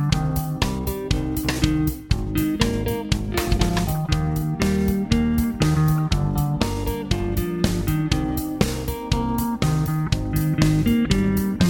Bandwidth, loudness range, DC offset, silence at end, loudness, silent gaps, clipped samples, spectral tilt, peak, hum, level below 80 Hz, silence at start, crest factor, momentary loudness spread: 17.5 kHz; 2 LU; under 0.1%; 0 s; -22 LUFS; none; under 0.1%; -6 dB/octave; -4 dBFS; none; -30 dBFS; 0 s; 18 dB; 5 LU